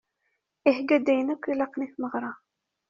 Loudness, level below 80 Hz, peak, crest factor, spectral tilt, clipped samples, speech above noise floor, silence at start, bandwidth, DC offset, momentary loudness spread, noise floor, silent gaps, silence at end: -26 LUFS; -74 dBFS; -6 dBFS; 22 dB; -3 dB/octave; under 0.1%; 52 dB; 0.65 s; 7.2 kHz; under 0.1%; 10 LU; -77 dBFS; none; 0.55 s